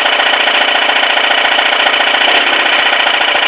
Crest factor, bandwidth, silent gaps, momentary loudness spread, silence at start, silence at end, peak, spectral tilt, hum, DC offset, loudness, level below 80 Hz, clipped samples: 10 dB; 4 kHz; none; 1 LU; 0 s; 0 s; 0 dBFS; -3.5 dB/octave; none; under 0.1%; -8 LUFS; -58 dBFS; 0.3%